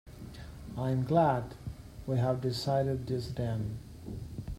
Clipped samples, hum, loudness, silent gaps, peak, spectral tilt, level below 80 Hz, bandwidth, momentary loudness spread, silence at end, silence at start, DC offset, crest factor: under 0.1%; none; -32 LUFS; none; -14 dBFS; -7.5 dB/octave; -50 dBFS; 15.5 kHz; 18 LU; 0 s; 0.05 s; under 0.1%; 18 dB